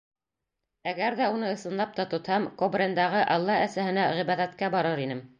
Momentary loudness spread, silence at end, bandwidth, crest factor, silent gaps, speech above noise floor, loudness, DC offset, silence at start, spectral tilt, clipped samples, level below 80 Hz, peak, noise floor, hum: 6 LU; 0.15 s; 9.8 kHz; 16 dB; none; 59 dB; -27 LUFS; under 0.1%; 0.85 s; -6 dB/octave; under 0.1%; -72 dBFS; -12 dBFS; -86 dBFS; none